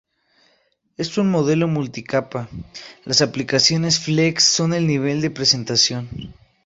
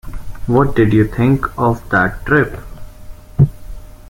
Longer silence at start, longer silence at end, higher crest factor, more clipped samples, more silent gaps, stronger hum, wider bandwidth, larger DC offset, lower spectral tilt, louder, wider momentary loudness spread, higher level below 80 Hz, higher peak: first, 1 s vs 0.05 s; first, 0.35 s vs 0.1 s; about the same, 18 dB vs 14 dB; neither; neither; neither; second, 8.2 kHz vs 16.5 kHz; neither; second, -3.5 dB/octave vs -8.5 dB/octave; second, -18 LUFS vs -15 LUFS; about the same, 17 LU vs 15 LU; second, -52 dBFS vs -30 dBFS; about the same, -2 dBFS vs -2 dBFS